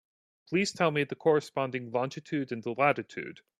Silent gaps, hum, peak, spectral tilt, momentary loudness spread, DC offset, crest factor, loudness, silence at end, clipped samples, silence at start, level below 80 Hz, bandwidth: none; none; -10 dBFS; -5.5 dB/octave; 8 LU; under 0.1%; 22 dB; -30 LUFS; 0.25 s; under 0.1%; 0.5 s; -74 dBFS; 12.5 kHz